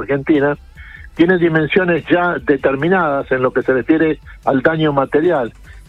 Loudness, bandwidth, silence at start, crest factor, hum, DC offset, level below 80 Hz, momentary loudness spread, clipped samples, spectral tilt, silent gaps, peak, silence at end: -15 LUFS; 5.4 kHz; 0 s; 14 dB; none; under 0.1%; -42 dBFS; 5 LU; under 0.1%; -8.5 dB/octave; none; 0 dBFS; 0.1 s